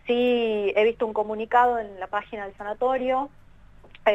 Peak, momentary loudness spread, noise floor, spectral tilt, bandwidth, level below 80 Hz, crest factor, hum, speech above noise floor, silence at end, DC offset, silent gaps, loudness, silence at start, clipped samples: -6 dBFS; 12 LU; -49 dBFS; -6 dB/octave; 7.8 kHz; -54 dBFS; 18 dB; none; 25 dB; 0 s; under 0.1%; none; -24 LUFS; 0.05 s; under 0.1%